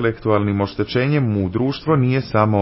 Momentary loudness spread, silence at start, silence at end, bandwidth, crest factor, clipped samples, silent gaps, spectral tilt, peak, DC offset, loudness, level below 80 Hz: 3 LU; 0 s; 0 s; 5.8 kHz; 16 dB; under 0.1%; none; -11.5 dB/octave; -2 dBFS; under 0.1%; -19 LUFS; -42 dBFS